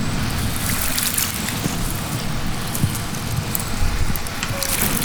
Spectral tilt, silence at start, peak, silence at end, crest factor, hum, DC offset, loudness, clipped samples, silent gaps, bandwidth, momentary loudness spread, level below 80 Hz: -3.5 dB/octave; 0 s; 0 dBFS; 0 s; 22 dB; none; under 0.1%; -22 LUFS; under 0.1%; none; over 20 kHz; 6 LU; -28 dBFS